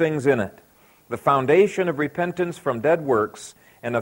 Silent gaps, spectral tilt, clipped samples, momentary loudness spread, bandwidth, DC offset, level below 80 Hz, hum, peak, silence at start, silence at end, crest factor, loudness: none; -6.5 dB/octave; under 0.1%; 16 LU; 16.5 kHz; under 0.1%; -60 dBFS; none; -4 dBFS; 0 s; 0 s; 18 dB; -22 LUFS